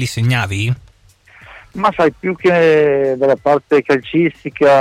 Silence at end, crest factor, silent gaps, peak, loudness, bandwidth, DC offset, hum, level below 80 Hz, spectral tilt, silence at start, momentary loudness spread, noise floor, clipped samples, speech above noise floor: 0 s; 12 dB; none; -4 dBFS; -15 LUFS; 15 kHz; under 0.1%; none; -48 dBFS; -6.5 dB/octave; 0 s; 8 LU; -48 dBFS; under 0.1%; 34 dB